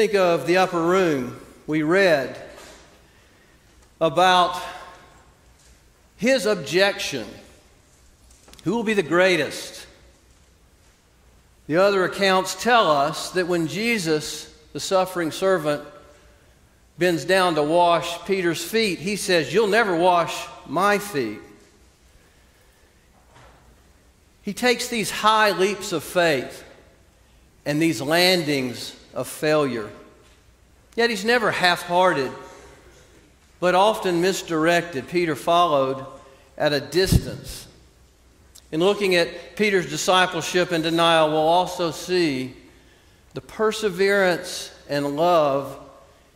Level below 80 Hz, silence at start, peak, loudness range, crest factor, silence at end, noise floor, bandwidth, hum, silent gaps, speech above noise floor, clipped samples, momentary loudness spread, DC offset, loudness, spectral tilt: -48 dBFS; 0 s; -2 dBFS; 5 LU; 20 dB; 0.45 s; -56 dBFS; 16 kHz; none; none; 35 dB; under 0.1%; 15 LU; under 0.1%; -21 LUFS; -4 dB/octave